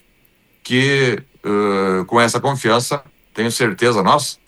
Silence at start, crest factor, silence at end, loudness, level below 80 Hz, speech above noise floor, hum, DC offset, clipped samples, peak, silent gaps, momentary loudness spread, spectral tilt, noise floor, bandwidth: 0.65 s; 16 dB; 0.15 s; -17 LUFS; -60 dBFS; 40 dB; none; under 0.1%; under 0.1%; 0 dBFS; none; 9 LU; -4.5 dB/octave; -57 dBFS; 15.5 kHz